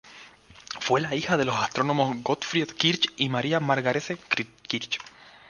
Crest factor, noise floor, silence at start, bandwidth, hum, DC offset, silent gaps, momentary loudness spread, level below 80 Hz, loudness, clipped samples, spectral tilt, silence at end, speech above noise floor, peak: 20 dB; -50 dBFS; 0.05 s; 10.5 kHz; none; under 0.1%; none; 8 LU; -64 dBFS; -26 LUFS; under 0.1%; -4.5 dB/octave; 0.2 s; 24 dB; -6 dBFS